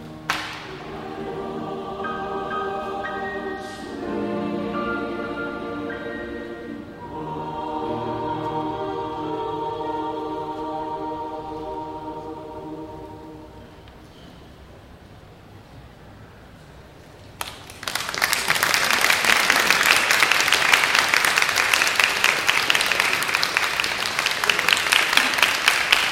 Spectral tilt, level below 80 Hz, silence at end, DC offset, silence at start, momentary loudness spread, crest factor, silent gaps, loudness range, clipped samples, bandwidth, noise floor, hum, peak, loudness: -1.5 dB/octave; -52 dBFS; 0 s; under 0.1%; 0 s; 18 LU; 24 dB; none; 19 LU; under 0.1%; 16.5 kHz; -45 dBFS; none; 0 dBFS; -21 LUFS